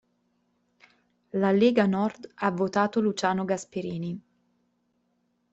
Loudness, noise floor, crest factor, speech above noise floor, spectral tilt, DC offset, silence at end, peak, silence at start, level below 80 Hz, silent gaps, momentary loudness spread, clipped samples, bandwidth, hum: -26 LUFS; -73 dBFS; 20 dB; 47 dB; -6.5 dB/octave; under 0.1%; 1.35 s; -8 dBFS; 1.35 s; -70 dBFS; none; 13 LU; under 0.1%; 8.2 kHz; none